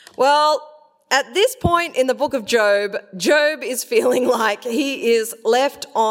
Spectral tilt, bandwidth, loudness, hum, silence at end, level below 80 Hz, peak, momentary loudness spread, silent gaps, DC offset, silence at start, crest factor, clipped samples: -3 dB/octave; 16.5 kHz; -18 LUFS; none; 0 s; -46 dBFS; -2 dBFS; 6 LU; none; under 0.1%; 0.2 s; 16 dB; under 0.1%